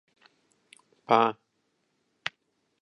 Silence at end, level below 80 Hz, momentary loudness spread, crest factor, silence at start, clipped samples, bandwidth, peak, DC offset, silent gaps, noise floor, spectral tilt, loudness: 1.5 s; -80 dBFS; 15 LU; 26 dB; 1.1 s; under 0.1%; 11 kHz; -6 dBFS; under 0.1%; none; -75 dBFS; -5 dB/octave; -27 LUFS